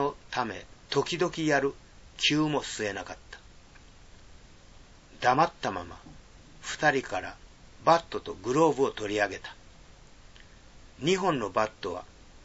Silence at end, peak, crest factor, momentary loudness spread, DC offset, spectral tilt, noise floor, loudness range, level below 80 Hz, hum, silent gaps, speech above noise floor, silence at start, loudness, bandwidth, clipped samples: 0.05 s; -8 dBFS; 22 dB; 18 LU; under 0.1%; -4 dB/octave; -52 dBFS; 5 LU; -56 dBFS; none; none; 24 dB; 0 s; -28 LUFS; 8 kHz; under 0.1%